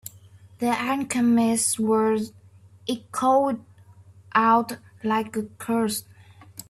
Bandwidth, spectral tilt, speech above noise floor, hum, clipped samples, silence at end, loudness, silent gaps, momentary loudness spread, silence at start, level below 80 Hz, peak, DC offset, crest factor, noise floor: 15 kHz; -4 dB/octave; 28 dB; none; under 0.1%; 0.05 s; -24 LUFS; none; 14 LU; 0.05 s; -66 dBFS; -6 dBFS; under 0.1%; 18 dB; -51 dBFS